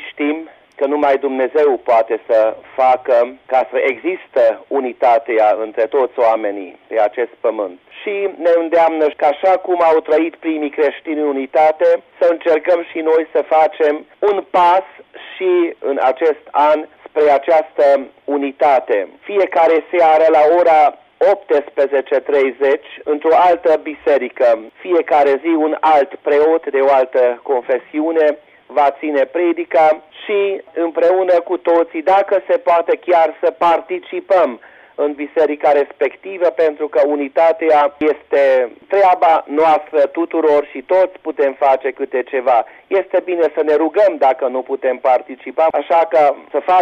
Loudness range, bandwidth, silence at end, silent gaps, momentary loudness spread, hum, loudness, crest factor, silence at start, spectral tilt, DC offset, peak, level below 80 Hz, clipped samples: 3 LU; 7.2 kHz; 0 s; none; 8 LU; none; -15 LUFS; 10 dB; 0 s; -5.5 dB/octave; under 0.1%; -4 dBFS; -64 dBFS; under 0.1%